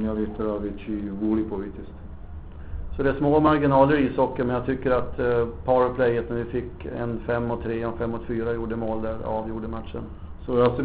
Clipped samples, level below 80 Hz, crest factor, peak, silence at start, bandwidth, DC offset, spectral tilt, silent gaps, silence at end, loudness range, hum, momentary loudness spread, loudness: under 0.1%; -40 dBFS; 20 dB; -6 dBFS; 0 s; 4.7 kHz; 0.1%; -6.5 dB/octave; none; 0 s; 7 LU; none; 18 LU; -25 LUFS